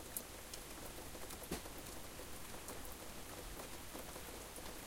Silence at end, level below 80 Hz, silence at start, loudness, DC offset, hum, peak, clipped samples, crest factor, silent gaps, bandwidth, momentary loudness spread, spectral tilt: 0 s; -58 dBFS; 0 s; -49 LUFS; under 0.1%; none; -20 dBFS; under 0.1%; 30 dB; none; 17 kHz; 3 LU; -3 dB/octave